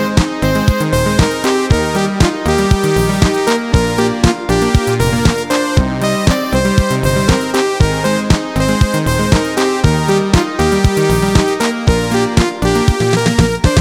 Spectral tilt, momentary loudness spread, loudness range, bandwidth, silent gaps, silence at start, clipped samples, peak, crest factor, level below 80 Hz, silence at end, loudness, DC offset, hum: -5.5 dB/octave; 2 LU; 1 LU; 18.5 kHz; none; 0 s; under 0.1%; 0 dBFS; 12 dB; -22 dBFS; 0 s; -13 LUFS; under 0.1%; none